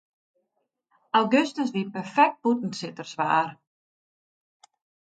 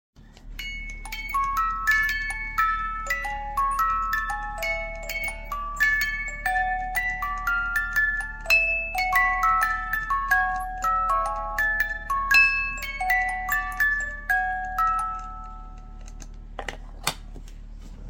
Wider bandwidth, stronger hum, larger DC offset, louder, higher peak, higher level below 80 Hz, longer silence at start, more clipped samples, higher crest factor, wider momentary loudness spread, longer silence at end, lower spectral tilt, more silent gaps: second, 9 kHz vs 17 kHz; neither; neither; about the same, -25 LUFS vs -24 LUFS; about the same, -6 dBFS vs -6 dBFS; second, -78 dBFS vs -38 dBFS; first, 1.15 s vs 0.2 s; neither; about the same, 22 dB vs 20 dB; second, 12 LU vs 16 LU; first, 1.6 s vs 0 s; first, -5 dB/octave vs -2 dB/octave; neither